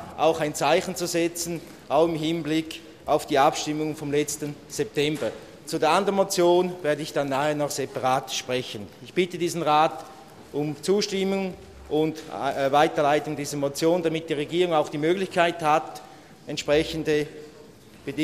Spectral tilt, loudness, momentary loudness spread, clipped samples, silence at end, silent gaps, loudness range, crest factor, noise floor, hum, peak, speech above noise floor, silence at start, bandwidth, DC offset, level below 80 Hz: -4.5 dB/octave; -25 LUFS; 13 LU; under 0.1%; 0 s; none; 2 LU; 20 dB; -48 dBFS; none; -4 dBFS; 24 dB; 0 s; 15 kHz; under 0.1%; -58 dBFS